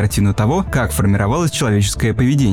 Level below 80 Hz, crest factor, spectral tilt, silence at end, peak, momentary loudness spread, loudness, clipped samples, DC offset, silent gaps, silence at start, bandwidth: -30 dBFS; 10 dB; -5.5 dB/octave; 0 s; -4 dBFS; 2 LU; -16 LUFS; under 0.1%; under 0.1%; none; 0 s; 17 kHz